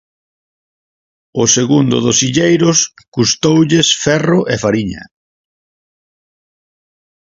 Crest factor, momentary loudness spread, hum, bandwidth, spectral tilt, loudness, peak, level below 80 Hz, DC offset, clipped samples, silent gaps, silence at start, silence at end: 16 dB; 8 LU; none; 7.8 kHz; -4 dB/octave; -12 LUFS; 0 dBFS; -48 dBFS; under 0.1%; under 0.1%; 3.08-3.12 s; 1.35 s; 2.35 s